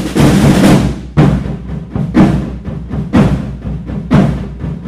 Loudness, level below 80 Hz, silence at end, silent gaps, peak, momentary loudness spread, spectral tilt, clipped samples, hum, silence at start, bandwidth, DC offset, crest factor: -12 LUFS; -24 dBFS; 0 s; none; 0 dBFS; 14 LU; -7 dB/octave; 0.2%; none; 0 s; 15.5 kHz; under 0.1%; 12 dB